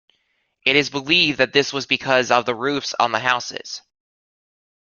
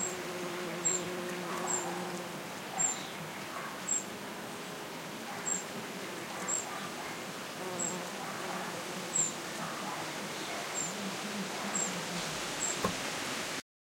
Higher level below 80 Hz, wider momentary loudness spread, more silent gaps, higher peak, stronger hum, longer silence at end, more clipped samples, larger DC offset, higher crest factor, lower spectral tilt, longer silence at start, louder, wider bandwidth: first, -62 dBFS vs -70 dBFS; about the same, 11 LU vs 9 LU; neither; first, -2 dBFS vs -18 dBFS; neither; first, 1.1 s vs 0.2 s; neither; neither; about the same, 20 dB vs 20 dB; about the same, -3 dB/octave vs -2 dB/octave; first, 0.65 s vs 0 s; first, -19 LUFS vs -36 LUFS; second, 7.4 kHz vs 16.5 kHz